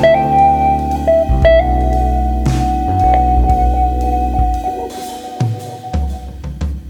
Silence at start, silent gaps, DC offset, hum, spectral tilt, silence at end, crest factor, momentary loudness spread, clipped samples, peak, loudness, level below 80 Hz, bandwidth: 0 s; none; under 0.1%; none; -7.5 dB/octave; 0 s; 14 dB; 13 LU; under 0.1%; 0 dBFS; -14 LUFS; -18 dBFS; 12.5 kHz